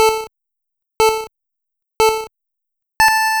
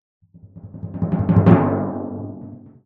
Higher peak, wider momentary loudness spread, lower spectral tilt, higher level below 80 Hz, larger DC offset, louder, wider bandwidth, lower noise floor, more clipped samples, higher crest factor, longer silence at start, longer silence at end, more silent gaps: about the same, -2 dBFS vs 0 dBFS; about the same, 22 LU vs 23 LU; second, -0.5 dB/octave vs -12 dB/octave; about the same, -46 dBFS vs -46 dBFS; neither; about the same, -16 LUFS vs -18 LUFS; first, over 20 kHz vs 3.9 kHz; first, -81 dBFS vs -42 dBFS; neither; about the same, 16 dB vs 20 dB; second, 0 s vs 0.45 s; second, 0 s vs 0.25 s; neither